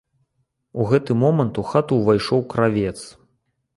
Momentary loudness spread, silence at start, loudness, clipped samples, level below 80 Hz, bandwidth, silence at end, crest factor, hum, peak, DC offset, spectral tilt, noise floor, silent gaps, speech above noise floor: 12 LU; 0.75 s; -20 LUFS; under 0.1%; -50 dBFS; 11.5 kHz; 0.65 s; 18 dB; none; -4 dBFS; under 0.1%; -7.5 dB/octave; -71 dBFS; none; 52 dB